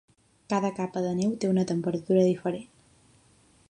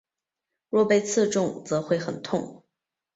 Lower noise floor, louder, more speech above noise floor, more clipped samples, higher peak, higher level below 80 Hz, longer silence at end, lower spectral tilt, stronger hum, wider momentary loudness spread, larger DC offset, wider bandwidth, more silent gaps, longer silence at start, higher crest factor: second, -61 dBFS vs -87 dBFS; about the same, -27 LUFS vs -25 LUFS; second, 35 dB vs 62 dB; neither; about the same, -10 dBFS vs -10 dBFS; about the same, -66 dBFS vs -68 dBFS; first, 1.05 s vs 0.6 s; first, -7 dB/octave vs -5 dB/octave; neither; about the same, 7 LU vs 9 LU; neither; first, 10.5 kHz vs 8.2 kHz; neither; second, 0.5 s vs 0.7 s; about the same, 18 dB vs 18 dB